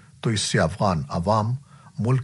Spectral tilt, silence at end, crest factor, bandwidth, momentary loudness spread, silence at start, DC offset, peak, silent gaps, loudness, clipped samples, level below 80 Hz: -5.5 dB/octave; 0 s; 16 dB; 11.5 kHz; 8 LU; 0.25 s; under 0.1%; -6 dBFS; none; -24 LUFS; under 0.1%; -48 dBFS